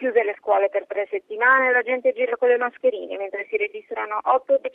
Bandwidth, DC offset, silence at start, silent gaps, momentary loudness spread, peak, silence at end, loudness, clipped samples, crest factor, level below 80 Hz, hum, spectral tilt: 3.8 kHz; under 0.1%; 0 s; none; 11 LU; -6 dBFS; 0.05 s; -22 LUFS; under 0.1%; 16 dB; -76 dBFS; none; -5 dB/octave